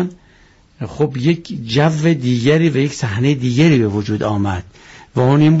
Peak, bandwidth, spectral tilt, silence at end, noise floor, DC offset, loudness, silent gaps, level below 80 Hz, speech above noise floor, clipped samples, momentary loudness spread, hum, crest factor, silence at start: -4 dBFS; 8 kHz; -6.5 dB/octave; 0 s; -49 dBFS; under 0.1%; -16 LUFS; none; -48 dBFS; 34 dB; under 0.1%; 10 LU; none; 12 dB; 0 s